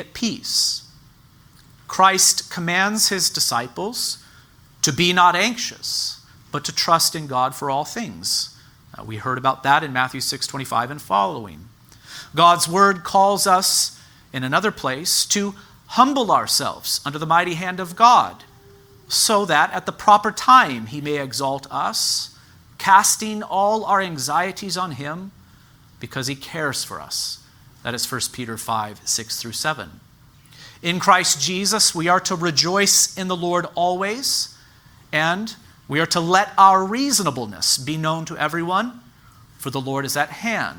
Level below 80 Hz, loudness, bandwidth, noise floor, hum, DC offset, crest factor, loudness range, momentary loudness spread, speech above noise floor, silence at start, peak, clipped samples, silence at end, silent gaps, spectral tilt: -58 dBFS; -19 LUFS; over 20 kHz; -51 dBFS; none; under 0.1%; 20 dB; 8 LU; 14 LU; 31 dB; 0 s; 0 dBFS; under 0.1%; 0 s; none; -2 dB/octave